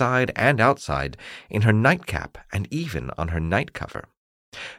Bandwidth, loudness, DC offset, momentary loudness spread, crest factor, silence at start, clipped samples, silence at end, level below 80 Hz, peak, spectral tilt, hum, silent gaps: 15 kHz; -23 LUFS; under 0.1%; 17 LU; 20 dB; 0 s; under 0.1%; 0 s; -42 dBFS; -4 dBFS; -6.5 dB/octave; none; 4.17-4.52 s